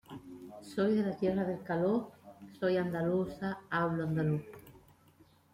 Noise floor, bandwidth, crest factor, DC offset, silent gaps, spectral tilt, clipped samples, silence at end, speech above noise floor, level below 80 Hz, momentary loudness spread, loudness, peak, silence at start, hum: -64 dBFS; 16 kHz; 14 dB; under 0.1%; none; -8 dB/octave; under 0.1%; 0.75 s; 31 dB; -66 dBFS; 18 LU; -33 LUFS; -20 dBFS; 0.1 s; none